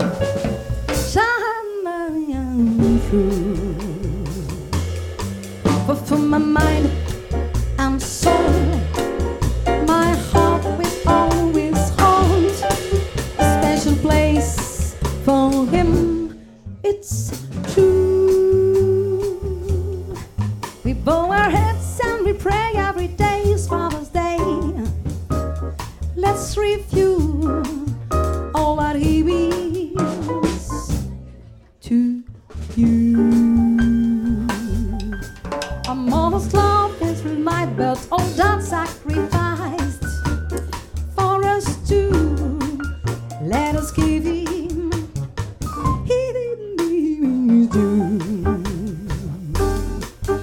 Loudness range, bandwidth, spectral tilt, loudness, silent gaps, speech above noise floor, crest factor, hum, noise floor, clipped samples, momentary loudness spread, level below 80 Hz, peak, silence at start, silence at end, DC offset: 5 LU; 17.5 kHz; -6 dB/octave; -20 LUFS; none; 26 dB; 18 dB; none; -43 dBFS; under 0.1%; 11 LU; -28 dBFS; 0 dBFS; 0 s; 0 s; under 0.1%